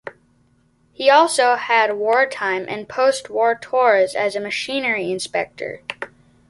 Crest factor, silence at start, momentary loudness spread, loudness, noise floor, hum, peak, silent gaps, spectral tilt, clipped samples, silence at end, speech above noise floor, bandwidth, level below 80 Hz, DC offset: 18 dB; 0.05 s; 15 LU; -18 LUFS; -59 dBFS; none; -2 dBFS; none; -2.5 dB/octave; under 0.1%; 0.4 s; 41 dB; 11.5 kHz; -64 dBFS; under 0.1%